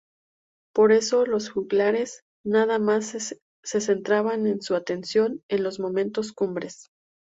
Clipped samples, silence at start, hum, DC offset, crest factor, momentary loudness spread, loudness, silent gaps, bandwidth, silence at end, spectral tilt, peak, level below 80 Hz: under 0.1%; 0.75 s; none; under 0.1%; 16 dB; 12 LU; -24 LUFS; 2.22-2.44 s, 3.42-3.63 s, 5.43-5.49 s; 8 kHz; 0.45 s; -4.5 dB/octave; -8 dBFS; -68 dBFS